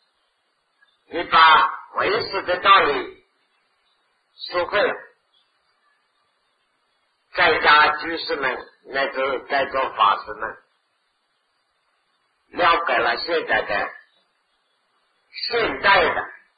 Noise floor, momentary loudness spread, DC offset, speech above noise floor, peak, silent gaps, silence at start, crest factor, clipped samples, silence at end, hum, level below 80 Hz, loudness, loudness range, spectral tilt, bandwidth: -69 dBFS; 17 LU; under 0.1%; 50 dB; -2 dBFS; none; 1.1 s; 22 dB; under 0.1%; 0.25 s; none; -56 dBFS; -19 LUFS; 10 LU; -6 dB/octave; 5 kHz